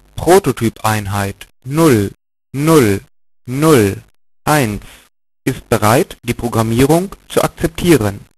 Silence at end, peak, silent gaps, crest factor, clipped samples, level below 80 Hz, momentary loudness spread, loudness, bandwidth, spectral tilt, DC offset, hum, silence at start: 0.2 s; 0 dBFS; none; 14 dB; under 0.1%; -38 dBFS; 12 LU; -14 LUFS; 14.5 kHz; -5.5 dB/octave; under 0.1%; none; 0.15 s